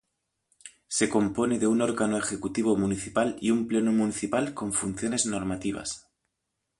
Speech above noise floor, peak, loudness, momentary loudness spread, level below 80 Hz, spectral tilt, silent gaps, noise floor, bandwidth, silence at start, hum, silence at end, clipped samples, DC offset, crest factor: 55 dB; -10 dBFS; -27 LUFS; 7 LU; -56 dBFS; -4.5 dB/octave; none; -82 dBFS; 11.5 kHz; 0.65 s; none; 0.8 s; under 0.1%; under 0.1%; 18 dB